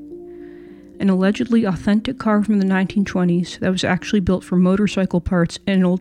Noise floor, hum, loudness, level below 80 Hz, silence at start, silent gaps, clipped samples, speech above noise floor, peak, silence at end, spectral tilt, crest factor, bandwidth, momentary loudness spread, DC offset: -40 dBFS; none; -19 LUFS; -42 dBFS; 0 s; none; under 0.1%; 22 dB; -4 dBFS; 0 s; -7 dB/octave; 14 dB; 10 kHz; 5 LU; under 0.1%